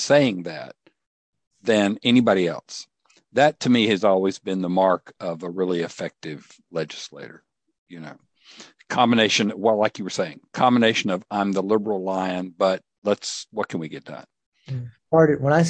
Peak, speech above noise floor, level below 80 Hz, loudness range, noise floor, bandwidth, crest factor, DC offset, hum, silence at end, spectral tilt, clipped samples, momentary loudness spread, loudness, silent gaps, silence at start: -4 dBFS; 26 dB; -66 dBFS; 8 LU; -48 dBFS; 9 kHz; 20 dB; under 0.1%; none; 0 s; -5 dB/octave; under 0.1%; 19 LU; -22 LUFS; 1.07-1.33 s, 1.47-1.51 s, 7.78-7.86 s, 12.98-13.02 s, 14.46-14.52 s; 0 s